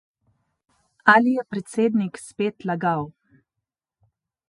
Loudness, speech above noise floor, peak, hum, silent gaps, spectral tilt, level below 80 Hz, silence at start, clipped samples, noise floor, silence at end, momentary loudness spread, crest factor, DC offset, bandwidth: -22 LUFS; 63 dB; 0 dBFS; none; none; -6 dB/octave; -68 dBFS; 1.05 s; under 0.1%; -84 dBFS; 1.4 s; 13 LU; 24 dB; under 0.1%; 11.5 kHz